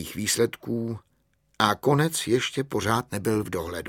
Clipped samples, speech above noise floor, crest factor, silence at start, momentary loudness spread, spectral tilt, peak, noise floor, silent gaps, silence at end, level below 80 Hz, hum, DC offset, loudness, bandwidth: under 0.1%; 43 dB; 24 dB; 0 s; 8 LU; -4.5 dB/octave; -2 dBFS; -68 dBFS; none; 0 s; -56 dBFS; none; under 0.1%; -25 LUFS; 18 kHz